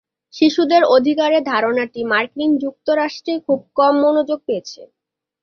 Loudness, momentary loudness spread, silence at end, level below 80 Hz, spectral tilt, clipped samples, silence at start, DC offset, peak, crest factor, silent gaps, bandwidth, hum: -17 LUFS; 9 LU; 0.55 s; -64 dBFS; -4.5 dB/octave; under 0.1%; 0.35 s; under 0.1%; -2 dBFS; 16 dB; none; 6.8 kHz; none